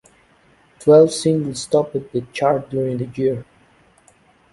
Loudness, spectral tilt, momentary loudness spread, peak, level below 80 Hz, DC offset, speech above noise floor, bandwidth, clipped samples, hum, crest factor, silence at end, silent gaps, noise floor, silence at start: -18 LUFS; -6 dB/octave; 12 LU; -2 dBFS; -56 dBFS; under 0.1%; 37 dB; 11.5 kHz; under 0.1%; none; 18 dB; 1.1 s; none; -55 dBFS; 0.8 s